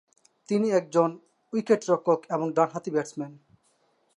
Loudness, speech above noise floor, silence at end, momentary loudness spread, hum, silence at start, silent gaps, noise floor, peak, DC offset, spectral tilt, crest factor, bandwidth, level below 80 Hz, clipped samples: -26 LUFS; 43 dB; 0.85 s; 10 LU; none; 0.5 s; none; -68 dBFS; -8 dBFS; under 0.1%; -6.5 dB/octave; 20 dB; 11 kHz; -80 dBFS; under 0.1%